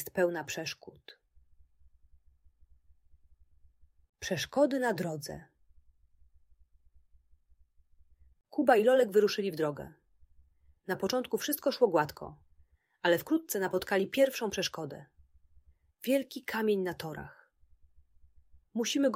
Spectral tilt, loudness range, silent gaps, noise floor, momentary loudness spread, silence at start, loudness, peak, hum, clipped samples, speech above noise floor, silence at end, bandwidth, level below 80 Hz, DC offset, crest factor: -4 dB/octave; 9 LU; 4.09-4.13 s; -66 dBFS; 19 LU; 0 s; -31 LUFS; -10 dBFS; none; under 0.1%; 36 dB; 0 s; 16 kHz; -66 dBFS; under 0.1%; 22 dB